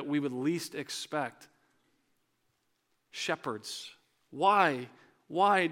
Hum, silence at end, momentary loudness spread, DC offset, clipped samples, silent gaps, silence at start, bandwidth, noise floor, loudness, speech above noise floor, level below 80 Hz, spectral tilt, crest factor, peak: none; 0 s; 18 LU; under 0.1%; under 0.1%; none; 0 s; 17 kHz; -77 dBFS; -31 LUFS; 46 dB; -88 dBFS; -4 dB/octave; 24 dB; -10 dBFS